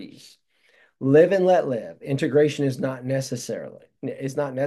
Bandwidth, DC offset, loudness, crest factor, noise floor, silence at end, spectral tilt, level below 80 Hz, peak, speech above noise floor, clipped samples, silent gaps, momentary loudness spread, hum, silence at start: 12.5 kHz; under 0.1%; -22 LUFS; 18 dB; -61 dBFS; 0 s; -6.5 dB/octave; -70 dBFS; -6 dBFS; 39 dB; under 0.1%; none; 17 LU; none; 0 s